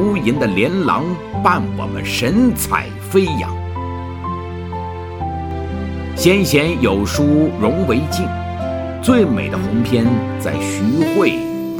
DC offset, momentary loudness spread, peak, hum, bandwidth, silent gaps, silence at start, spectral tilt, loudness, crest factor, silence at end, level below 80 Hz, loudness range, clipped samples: under 0.1%; 11 LU; 0 dBFS; none; 19.5 kHz; none; 0 s; -6 dB/octave; -17 LUFS; 16 dB; 0 s; -34 dBFS; 5 LU; under 0.1%